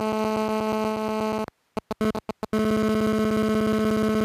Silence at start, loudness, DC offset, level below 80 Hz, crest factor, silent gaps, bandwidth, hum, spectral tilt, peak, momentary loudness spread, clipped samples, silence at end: 0 s; -25 LUFS; under 0.1%; -50 dBFS; 12 dB; none; 15.5 kHz; none; -6 dB/octave; -14 dBFS; 9 LU; under 0.1%; 0 s